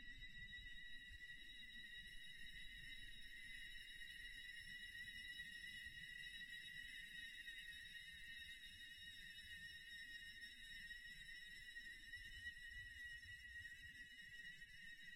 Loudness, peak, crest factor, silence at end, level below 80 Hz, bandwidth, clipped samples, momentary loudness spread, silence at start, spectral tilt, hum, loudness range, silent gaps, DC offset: -55 LUFS; -42 dBFS; 14 dB; 0 s; -68 dBFS; 16 kHz; under 0.1%; 4 LU; 0 s; -0.5 dB/octave; none; 2 LU; none; under 0.1%